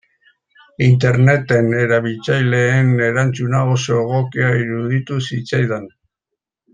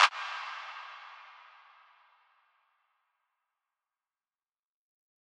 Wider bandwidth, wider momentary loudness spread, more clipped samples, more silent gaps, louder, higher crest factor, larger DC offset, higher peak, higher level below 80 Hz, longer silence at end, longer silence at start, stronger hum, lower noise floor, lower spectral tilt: second, 7.6 kHz vs 10.5 kHz; second, 7 LU vs 21 LU; neither; neither; first, -16 LUFS vs -35 LUFS; second, 16 dB vs 30 dB; neither; first, -2 dBFS vs -8 dBFS; first, -52 dBFS vs under -90 dBFS; second, 0.85 s vs 3.85 s; first, 0.8 s vs 0 s; neither; second, -81 dBFS vs under -90 dBFS; first, -7 dB/octave vs 6.5 dB/octave